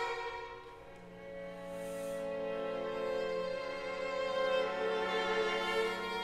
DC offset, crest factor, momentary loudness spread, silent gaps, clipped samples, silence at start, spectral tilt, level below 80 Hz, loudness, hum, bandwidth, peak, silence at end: under 0.1%; 16 dB; 15 LU; none; under 0.1%; 0 s; -4 dB/octave; -64 dBFS; -36 LUFS; none; 15 kHz; -22 dBFS; 0 s